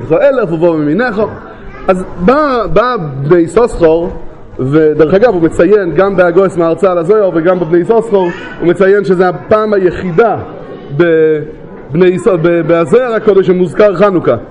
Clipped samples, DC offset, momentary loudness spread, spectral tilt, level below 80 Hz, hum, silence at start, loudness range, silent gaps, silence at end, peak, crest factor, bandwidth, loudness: 0.4%; under 0.1%; 10 LU; -8 dB/octave; -34 dBFS; none; 0 s; 2 LU; none; 0 s; 0 dBFS; 10 dB; 10.5 kHz; -10 LUFS